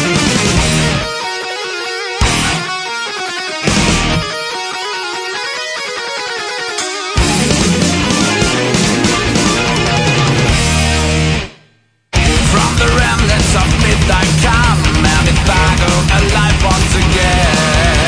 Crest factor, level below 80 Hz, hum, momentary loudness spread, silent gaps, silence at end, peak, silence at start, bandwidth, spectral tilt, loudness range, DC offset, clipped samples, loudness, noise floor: 12 dB; -20 dBFS; none; 8 LU; none; 0 s; 0 dBFS; 0 s; 11 kHz; -4 dB/octave; 5 LU; under 0.1%; under 0.1%; -12 LUFS; -52 dBFS